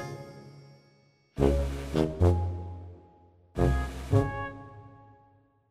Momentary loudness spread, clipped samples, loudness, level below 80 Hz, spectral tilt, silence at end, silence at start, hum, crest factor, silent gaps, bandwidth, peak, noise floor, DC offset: 23 LU; under 0.1%; -29 LUFS; -38 dBFS; -8 dB/octave; 0.8 s; 0 s; none; 22 dB; none; 13 kHz; -8 dBFS; -64 dBFS; under 0.1%